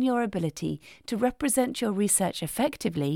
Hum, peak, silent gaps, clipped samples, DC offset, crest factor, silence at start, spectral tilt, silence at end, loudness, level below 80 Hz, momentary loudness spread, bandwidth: none; -10 dBFS; none; under 0.1%; under 0.1%; 18 dB; 0 s; -4.5 dB/octave; 0 s; -27 LUFS; -56 dBFS; 10 LU; 18 kHz